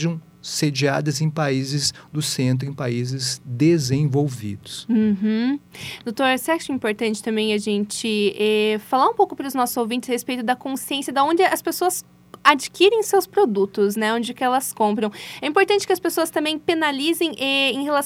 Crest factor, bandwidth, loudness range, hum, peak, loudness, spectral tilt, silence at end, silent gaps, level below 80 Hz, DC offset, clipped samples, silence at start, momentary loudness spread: 20 dB; 17 kHz; 3 LU; none; 0 dBFS; -21 LUFS; -4.5 dB/octave; 0 s; none; -62 dBFS; under 0.1%; under 0.1%; 0 s; 8 LU